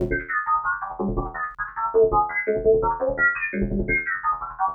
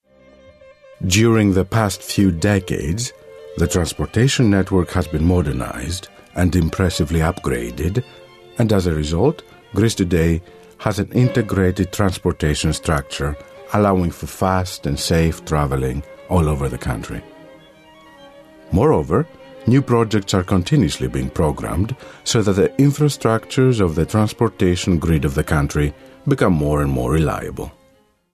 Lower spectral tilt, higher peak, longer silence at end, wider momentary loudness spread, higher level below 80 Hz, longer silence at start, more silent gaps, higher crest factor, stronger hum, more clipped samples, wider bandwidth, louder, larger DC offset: first, -11 dB/octave vs -6 dB/octave; second, -8 dBFS vs 0 dBFS; second, 0 s vs 0.65 s; about the same, 8 LU vs 10 LU; second, -38 dBFS vs -32 dBFS; second, 0 s vs 1 s; neither; about the same, 14 dB vs 18 dB; neither; neither; second, 2.9 kHz vs 14 kHz; second, -23 LUFS vs -19 LUFS; neither